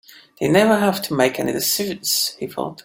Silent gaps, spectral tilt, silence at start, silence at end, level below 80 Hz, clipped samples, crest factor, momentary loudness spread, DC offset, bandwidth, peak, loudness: none; -3.5 dB/octave; 0.4 s; 0.05 s; -58 dBFS; under 0.1%; 18 dB; 9 LU; under 0.1%; 17 kHz; -2 dBFS; -19 LUFS